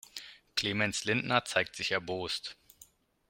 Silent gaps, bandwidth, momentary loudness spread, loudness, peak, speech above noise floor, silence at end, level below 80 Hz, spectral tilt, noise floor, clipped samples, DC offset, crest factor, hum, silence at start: none; 16.5 kHz; 13 LU; -31 LUFS; -10 dBFS; 29 dB; 0.45 s; -68 dBFS; -3 dB/octave; -61 dBFS; under 0.1%; under 0.1%; 26 dB; none; 0.15 s